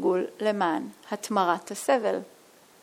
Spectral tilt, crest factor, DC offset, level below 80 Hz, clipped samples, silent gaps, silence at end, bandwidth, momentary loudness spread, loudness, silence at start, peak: -4.5 dB/octave; 18 dB; under 0.1%; -82 dBFS; under 0.1%; none; 0.55 s; 17 kHz; 9 LU; -27 LUFS; 0 s; -10 dBFS